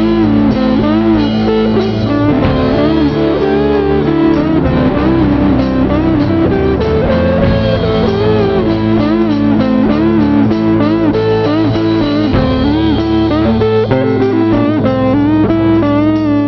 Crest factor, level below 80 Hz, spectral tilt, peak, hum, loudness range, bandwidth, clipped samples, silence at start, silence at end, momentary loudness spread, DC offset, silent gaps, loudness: 8 dB; -26 dBFS; -6.5 dB/octave; -2 dBFS; none; 1 LU; 6.2 kHz; under 0.1%; 0 s; 0 s; 2 LU; under 0.1%; none; -11 LUFS